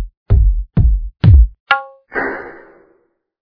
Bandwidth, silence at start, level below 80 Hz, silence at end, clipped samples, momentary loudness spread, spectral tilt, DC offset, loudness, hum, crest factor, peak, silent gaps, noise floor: 5.2 kHz; 0 s; -16 dBFS; 0.9 s; 0.3%; 14 LU; -9.5 dB/octave; under 0.1%; -15 LUFS; none; 14 dB; 0 dBFS; 0.17-0.26 s, 1.60-1.66 s; -59 dBFS